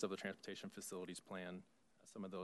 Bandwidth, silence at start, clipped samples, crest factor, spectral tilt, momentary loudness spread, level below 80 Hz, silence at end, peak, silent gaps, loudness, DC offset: 12 kHz; 0 s; under 0.1%; 20 dB; -4 dB/octave; 10 LU; under -90 dBFS; 0 s; -30 dBFS; none; -50 LUFS; under 0.1%